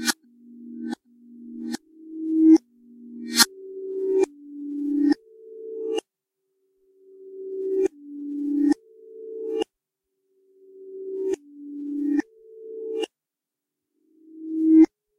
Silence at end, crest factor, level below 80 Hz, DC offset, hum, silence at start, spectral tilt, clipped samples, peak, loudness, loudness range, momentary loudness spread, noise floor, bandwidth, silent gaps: 0.35 s; 26 dB; -70 dBFS; under 0.1%; none; 0 s; -2 dB/octave; under 0.1%; 0 dBFS; -24 LUFS; 9 LU; 23 LU; -88 dBFS; 15.5 kHz; none